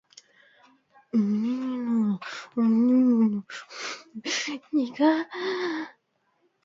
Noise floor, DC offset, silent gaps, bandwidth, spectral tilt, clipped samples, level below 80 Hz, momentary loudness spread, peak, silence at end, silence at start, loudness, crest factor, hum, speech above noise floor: -71 dBFS; under 0.1%; none; 7.6 kHz; -5 dB/octave; under 0.1%; -78 dBFS; 15 LU; -8 dBFS; 0.75 s; 1.15 s; -26 LUFS; 18 dB; none; 46 dB